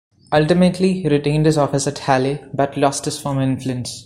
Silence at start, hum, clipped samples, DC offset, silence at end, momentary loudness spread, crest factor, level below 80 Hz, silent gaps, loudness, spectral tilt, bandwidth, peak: 0.3 s; none; under 0.1%; under 0.1%; 0 s; 7 LU; 18 dB; -48 dBFS; none; -18 LUFS; -6 dB/octave; 15 kHz; 0 dBFS